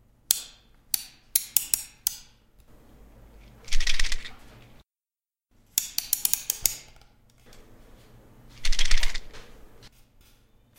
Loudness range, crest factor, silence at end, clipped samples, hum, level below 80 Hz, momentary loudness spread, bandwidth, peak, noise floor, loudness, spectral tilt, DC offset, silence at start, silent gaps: 6 LU; 26 dB; 1.4 s; under 0.1%; none; -32 dBFS; 18 LU; 17 kHz; 0 dBFS; under -90 dBFS; -27 LUFS; 0.5 dB/octave; under 0.1%; 0.3 s; none